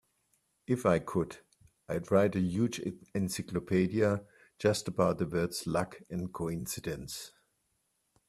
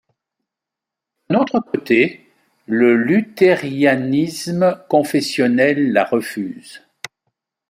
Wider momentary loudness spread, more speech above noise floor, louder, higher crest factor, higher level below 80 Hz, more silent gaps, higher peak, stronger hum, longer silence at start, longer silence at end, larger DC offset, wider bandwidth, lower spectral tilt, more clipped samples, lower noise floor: about the same, 11 LU vs 13 LU; second, 46 dB vs 69 dB; second, -32 LUFS vs -17 LUFS; about the same, 20 dB vs 16 dB; about the same, -62 dBFS vs -64 dBFS; neither; second, -12 dBFS vs -2 dBFS; neither; second, 0.7 s vs 1.3 s; about the same, 1 s vs 0.9 s; neither; second, 14.5 kHz vs 16 kHz; about the same, -6 dB/octave vs -6 dB/octave; neither; second, -78 dBFS vs -85 dBFS